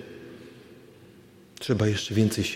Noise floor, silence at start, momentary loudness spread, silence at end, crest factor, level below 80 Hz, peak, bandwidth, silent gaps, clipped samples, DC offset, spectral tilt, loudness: -52 dBFS; 0 s; 23 LU; 0 s; 20 dB; -60 dBFS; -10 dBFS; 16 kHz; none; under 0.1%; under 0.1%; -5.5 dB/octave; -26 LUFS